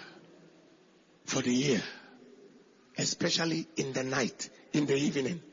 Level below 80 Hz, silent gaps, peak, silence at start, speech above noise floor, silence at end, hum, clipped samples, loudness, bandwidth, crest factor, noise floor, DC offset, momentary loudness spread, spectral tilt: -74 dBFS; none; -16 dBFS; 0 s; 31 dB; 0.05 s; none; under 0.1%; -31 LUFS; 7.6 kHz; 18 dB; -62 dBFS; under 0.1%; 15 LU; -4 dB/octave